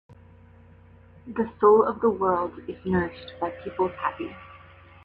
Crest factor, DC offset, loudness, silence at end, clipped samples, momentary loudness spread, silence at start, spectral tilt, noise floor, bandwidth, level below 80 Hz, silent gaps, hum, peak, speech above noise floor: 20 dB; under 0.1%; -25 LUFS; 0.5 s; under 0.1%; 17 LU; 1.25 s; -9.5 dB/octave; -51 dBFS; 4.7 kHz; -56 dBFS; none; none; -8 dBFS; 27 dB